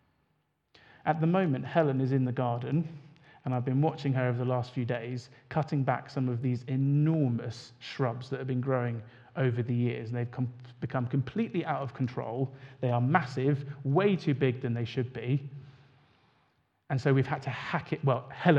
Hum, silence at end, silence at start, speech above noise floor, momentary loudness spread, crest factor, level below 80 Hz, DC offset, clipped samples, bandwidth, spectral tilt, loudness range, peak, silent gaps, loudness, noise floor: none; 0 s; 1.05 s; 46 dB; 9 LU; 24 dB; -72 dBFS; under 0.1%; under 0.1%; 7.6 kHz; -8.5 dB/octave; 3 LU; -6 dBFS; none; -31 LUFS; -75 dBFS